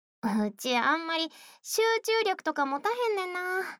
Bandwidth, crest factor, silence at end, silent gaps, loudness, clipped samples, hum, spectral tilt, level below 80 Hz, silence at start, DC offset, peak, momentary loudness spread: 20 kHz; 16 dB; 0.05 s; none; -28 LUFS; under 0.1%; none; -3 dB/octave; -82 dBFS; 0.25 s; under 0.1%; -14 dBFS; 6 LU